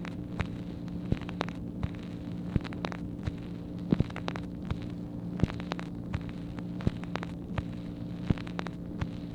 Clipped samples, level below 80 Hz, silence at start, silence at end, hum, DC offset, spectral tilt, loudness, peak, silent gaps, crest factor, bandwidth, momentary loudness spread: under 0.1%; -46 dBFS; 0 s; 0 s; none; under 0.1%; -7.5 dB/octave; -36 LUFS; -10 dBFS; none; 24 dB; 10 kHz; 7 LU